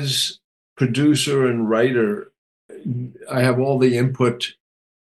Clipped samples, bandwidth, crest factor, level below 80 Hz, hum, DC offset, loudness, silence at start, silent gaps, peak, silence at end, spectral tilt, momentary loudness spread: under 0.1%; 12.5 kHz; 16 dB; -64 dBFS; none; under 0.1%; -20 LUFS; 0 s; 0.44-0.76 s, 2.38-2.69 s; -4 dBFS; 0.55 s; -5.5 dB/octave; 11 LU